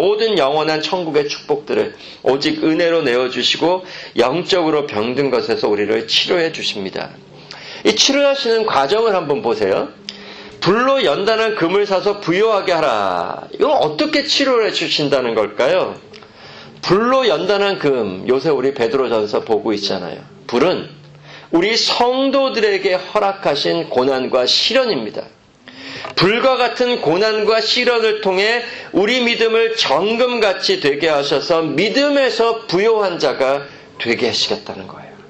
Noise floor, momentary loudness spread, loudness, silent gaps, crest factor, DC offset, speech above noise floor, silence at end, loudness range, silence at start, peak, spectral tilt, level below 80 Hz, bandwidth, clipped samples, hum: -39 dBFS; 10 LU; -16 LUFS; none; 16 dB; under 0.1%; 23 dB; 0.05 s; 2 LU; 0 s; 0 dBFS; -3.5 dB/octave; -54 dBFS; 8.6 kHz; under 0.1%; none